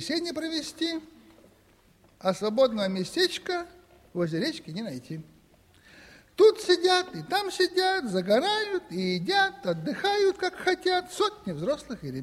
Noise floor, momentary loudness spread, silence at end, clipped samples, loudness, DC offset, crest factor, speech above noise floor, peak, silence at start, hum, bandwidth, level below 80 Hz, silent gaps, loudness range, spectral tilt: -61 dBFS; 14 LU; 0 s; under 0.1%; -27 LUFS; under 0.1%; 20 dB; 34 dB; -8 dBFS; 0 s; none; 14.5 kHz; -64 dBFS; none; 5 LU; -4.5 dB/octave